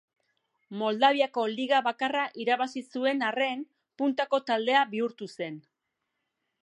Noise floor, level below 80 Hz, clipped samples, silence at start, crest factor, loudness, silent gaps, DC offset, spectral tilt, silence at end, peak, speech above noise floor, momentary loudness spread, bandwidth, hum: -83 dBFS; -88 dBFS; under 0.1%; 0.7 s; 22 dB; -28 LUFS; none; under 0.1%; -4.5 dB/octave; 1.05 s; -8 dBFS; 55 dB; 14 LU; 11 kHz; none